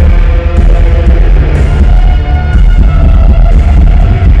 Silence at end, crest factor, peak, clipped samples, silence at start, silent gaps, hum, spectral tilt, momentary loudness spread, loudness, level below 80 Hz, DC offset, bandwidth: 0 s; 4 dB; 0 dBFS; under 0.1%; 0 s; none; none; -8.5 dB/octave; 2 LU; -8 LUFS; -4 dBFS; under 0.1%; 4.9 kHz